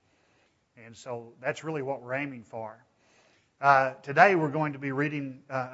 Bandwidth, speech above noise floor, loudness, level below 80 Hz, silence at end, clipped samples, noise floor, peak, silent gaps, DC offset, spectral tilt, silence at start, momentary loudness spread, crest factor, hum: 8 kHz; 40 dB; -27 LUFS; -78 dBFS; 0 s; under 0.1%; -68 dBFS; -4 dBFS; none; under 0.1%; -6.5 dB/octave; 0.8 s; 19 LU; 24 dB; none